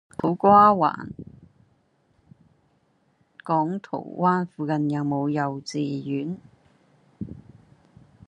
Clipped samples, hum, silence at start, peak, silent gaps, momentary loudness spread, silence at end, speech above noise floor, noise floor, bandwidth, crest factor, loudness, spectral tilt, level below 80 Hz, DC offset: under 0.1%; none; 0.2 s; -4 dBFS; none; 23 LU; 0.9 s; 43 dB; -66 dBFS; 10.5 kHz; 22 dB; -23 LUFS; -7.5 dB/octave; -64 dBFS; under 0.1%